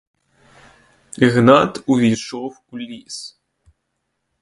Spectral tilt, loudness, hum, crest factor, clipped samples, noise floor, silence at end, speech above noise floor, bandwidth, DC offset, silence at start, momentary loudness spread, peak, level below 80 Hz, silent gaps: -6 dB/octave; -15 LUFS; none; 20 dB; under 0.1%; -74 dBFS; 1.15 s; 57 dB; 11.5 kHz; under 0.1%; 1.2 s; 20 LU; 0 dBFS; -56 dBFS; none